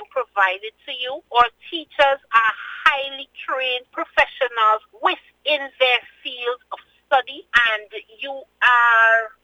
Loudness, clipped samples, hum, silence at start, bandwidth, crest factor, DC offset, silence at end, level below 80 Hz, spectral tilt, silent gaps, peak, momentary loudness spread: -19 LUFS; under 0.1%; none; 0 s; 18.5 kHz; 20 dB; under 0.1%; 0.15 s; -58 dBFS; -1.5 dB/octave; none; 0 dBFS; 16 LU